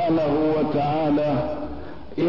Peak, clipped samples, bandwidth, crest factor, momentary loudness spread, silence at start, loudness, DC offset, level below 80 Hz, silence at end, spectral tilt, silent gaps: -12 dBFS; under 0.1%; 6 kHz; 10 dB; 13 LU; 0 s; -22 LUFS; 1%; -46 dBFS; 0 s; -9.5 dB/octave; none